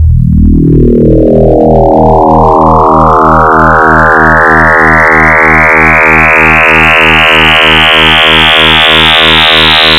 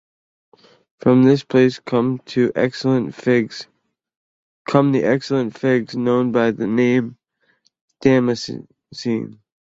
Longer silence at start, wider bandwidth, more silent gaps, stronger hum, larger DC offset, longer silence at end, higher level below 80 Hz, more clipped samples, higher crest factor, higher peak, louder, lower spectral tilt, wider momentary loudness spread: second, 0 s vs 1.05 s; first, 19 kHz vs 7.8 kHz; second, none vs 4.17-4.65 s, 7.81-7.88 s; neither; first, 0.3% vs under 0.1%; second, 0 s vs 0.4 s; first, -16 dBFS vs -60 dBFS; first, 8% vs under 0.1%; second, 4 dB vs 18 dB; about the same, 0 dBFS vs -2 dBFS; first, -3 LUFS vs -18 LUFS; second, -5.5 dB/octave vs -7 dB/octave; second, 3 LU vs 13 LU